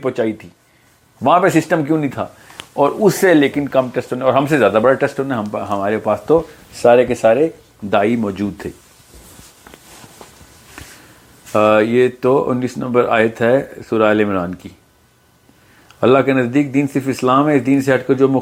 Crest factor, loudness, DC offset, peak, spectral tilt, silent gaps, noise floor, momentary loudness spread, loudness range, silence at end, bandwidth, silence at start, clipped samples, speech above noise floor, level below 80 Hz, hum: 16 dB; -15 LUFS; under 0.1%; 0 dBFS; -6.5 dB/octave; none; -53 dBFS; 11 LU; 6 LU; 0 s; 16.5 kHz; 0 s; under 0.1%; 38 dB; -54 dBFS; none